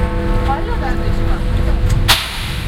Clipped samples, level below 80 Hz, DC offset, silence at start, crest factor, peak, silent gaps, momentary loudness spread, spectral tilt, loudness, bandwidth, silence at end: under 0.1%; -18 dBFS; under 0.1%; 0 s; 14 dB; 0 dBFS; none; 7 LU; -4.5 dB/octave; -17 LUFS; 16.5 kHz; 0 s